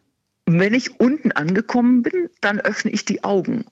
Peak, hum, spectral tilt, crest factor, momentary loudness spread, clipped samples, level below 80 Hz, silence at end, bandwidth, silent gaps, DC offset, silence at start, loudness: -4 dBFS; none; -6 dB/octave; 14 dB; 6 LU; under 0.1%; -64 dBFS; 0.1 s; 8 kHz; none; under 0.1%; 0.45 s; -19 LUFS